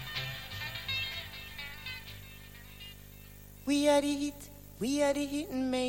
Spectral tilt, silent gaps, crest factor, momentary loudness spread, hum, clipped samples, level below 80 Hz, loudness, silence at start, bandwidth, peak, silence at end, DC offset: -4 dB/octave; none; 20 dB; 21 LU; 50 Hz at -50 dBFS; under 0.1%; -54 dBFS; -33 LUFS; 0 s; 17 kHz; -14 dBFS; 0 s; under 0.1%